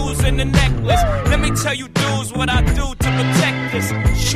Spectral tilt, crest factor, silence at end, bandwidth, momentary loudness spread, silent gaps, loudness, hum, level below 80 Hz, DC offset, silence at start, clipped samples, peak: -4.5 dB/octave; 14 dB; 0 s; 15.5 kHz; 4 LU; none; -17 LUFS; none; -22 dBFS; under 0.1%; 0 s; under 0.1%; -2 dBFS